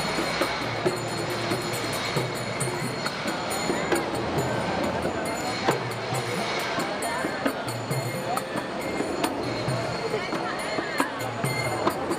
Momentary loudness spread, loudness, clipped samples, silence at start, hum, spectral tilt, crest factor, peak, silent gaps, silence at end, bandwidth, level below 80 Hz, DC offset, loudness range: 3 LU; -27 LUFS; under 0.1%; 0 s; none; -4 dB/octave; 20 dB; -8 dBFS; none; 0 s; 16 kHz; -54 dBFS; under 0.1%; 1 LU